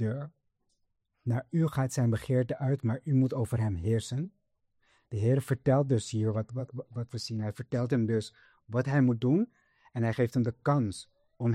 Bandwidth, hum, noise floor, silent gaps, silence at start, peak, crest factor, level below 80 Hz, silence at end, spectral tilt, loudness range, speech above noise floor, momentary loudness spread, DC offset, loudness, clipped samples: 13.5 kHz; none; -77 dBFS; none; 0 s; -14 dBFS; 16 dB; -60 dBFS; 0 s; -7.5 dB/octave; 2 LU; 48 dB; 12 LU; under 0.1%; -30 LUFS; under 0.1%